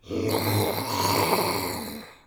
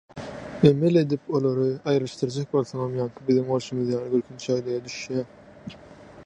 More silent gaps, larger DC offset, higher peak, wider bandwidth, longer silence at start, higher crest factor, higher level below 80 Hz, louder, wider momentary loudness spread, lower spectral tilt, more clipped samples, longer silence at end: neither; neither; second, -8 dBFS vs -4 dBFS; first, over 20 kHz vs 10 kHz; about the same, 0.05 s vs 0.15 s; about the same, 18 dB vs 22 dB; about the same, -58 dBFS vs -58 dBFS; about the same, -25 LUFS vs -25 LUFS; second, 9 LU vs 17 LU; second, -4 dB/octave vs -7 dB/octave; neither; first, 0.15 s vs 0 s